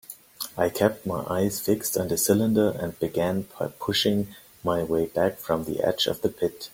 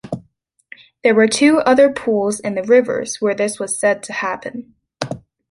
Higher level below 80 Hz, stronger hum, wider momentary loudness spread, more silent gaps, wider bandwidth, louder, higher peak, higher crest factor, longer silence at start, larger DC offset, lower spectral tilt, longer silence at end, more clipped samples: about the same, -56 dBFS vs -58 dBFS; neither; second, 9 LU vs 18 LU; neither; first, 17 kHz vs 11.5 kHz; second, -26 LUFS vs -16 LUFS; about the same, -4 dBFS vs -2 dBFS; first, 22 dB vs 16 dB; about the same, 0.1 s vs 0.05 s; neither; about the same, -4.5 dB/octave vs -4 dB/octave; second, 0.05 s vs 0.3 s; neither